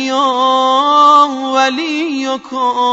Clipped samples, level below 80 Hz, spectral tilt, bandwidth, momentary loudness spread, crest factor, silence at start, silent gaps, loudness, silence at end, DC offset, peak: under 0.1%; -66 dBFS; -1.5 dB/octave; 8 kHz; 10 LU; 12 dB; 0 s; none; -12 LUFS; 0 s; under 0.1%; 0 dBFS